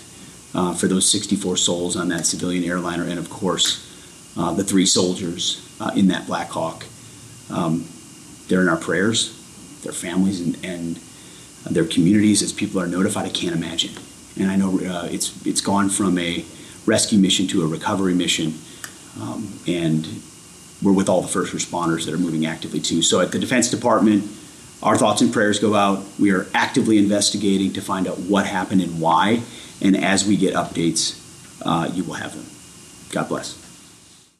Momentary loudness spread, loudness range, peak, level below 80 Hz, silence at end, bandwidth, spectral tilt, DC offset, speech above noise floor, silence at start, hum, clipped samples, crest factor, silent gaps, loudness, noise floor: 20 LU; 5 LU; -6 dBFS; -56 dBFS; 0.65 s; 14 kHz; -4 dB/octave; under 0.1%; 29 dB; 0 s; none; under 0.1%; 16 dB; none; -20 LUFS; -49 dBFS